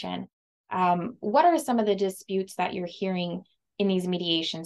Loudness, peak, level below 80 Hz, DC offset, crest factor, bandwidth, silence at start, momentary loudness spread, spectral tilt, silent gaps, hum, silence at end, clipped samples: -27 LUFS; -10 dBFS; -72 dBFS; under 0.1%; 18 dB; 12.5 kHz; 0 s; 13 LU; -5.5 dB/octave; 0.33-0.64 s; none; 0 s; under 0.1%